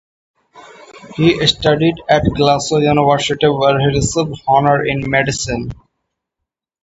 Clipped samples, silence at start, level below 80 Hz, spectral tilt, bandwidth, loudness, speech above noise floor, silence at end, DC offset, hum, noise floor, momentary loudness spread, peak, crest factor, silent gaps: under 0.1%; 0.55 s; -38 dBFS; -5 dB/octave; 8 kHz; -14 LUFS; 66 dB; 1.1 s; under 0.1%; none; -80 dBFS; 7 LU; 0 dBFS; 16 dB; none